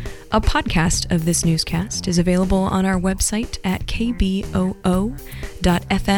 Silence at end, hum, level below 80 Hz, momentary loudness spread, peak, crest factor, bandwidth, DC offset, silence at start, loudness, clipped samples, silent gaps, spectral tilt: 0 s; none; -28 dBFS; 6 LU; -6 dBFS; 14 dB; 19 kHz; under 0.1%; 0 s; -20 LUFS; under 0.1%; none; -5 dB/octave